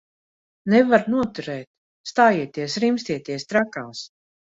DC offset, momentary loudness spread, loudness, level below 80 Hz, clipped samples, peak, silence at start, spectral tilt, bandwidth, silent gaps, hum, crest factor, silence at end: under 0.1%; 17 LU; -21 LUFS; -62 dBFS; under 0.1%; -2 dBFS; 0.65 s; -5.5 dB/octave; 8 kHz; 1.67-2.04 s; none; 20 dB; 0.45 s